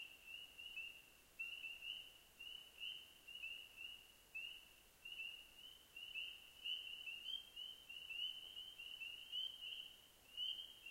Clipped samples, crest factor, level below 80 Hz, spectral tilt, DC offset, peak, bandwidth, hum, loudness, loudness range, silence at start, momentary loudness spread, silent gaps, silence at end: under 0.1%; 18 dB; -80 dBFS; 1 dB/octave; under 0.1%; -36 dBFS; 16 kHz; none; -50 LUFS; 4 LU; 0 s; 11 LU; none; 0 s